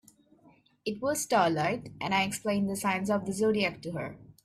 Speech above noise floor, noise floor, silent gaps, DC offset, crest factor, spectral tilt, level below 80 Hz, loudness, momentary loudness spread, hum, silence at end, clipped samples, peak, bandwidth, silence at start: 33 dB; -62 dBFS; none; under 0.1%; 18 dB; -4.5 dB/octave; -64 dBFS; -30 LUFS; 11 LU; none; 0.15 s; under 0.1%; -12 dBFS; 15.5 kHz; 0.85 s